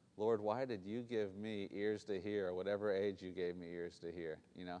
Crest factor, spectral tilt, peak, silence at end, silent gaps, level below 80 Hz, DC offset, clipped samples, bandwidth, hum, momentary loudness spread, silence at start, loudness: 16 dB; -6.5 dB/octave; -26 dBFS; 0 s; none; -78 dBFS; under 0.1%; under 0.1%; 9.8 kHz; none; 10 LU; 0.15 s; -42 LUFS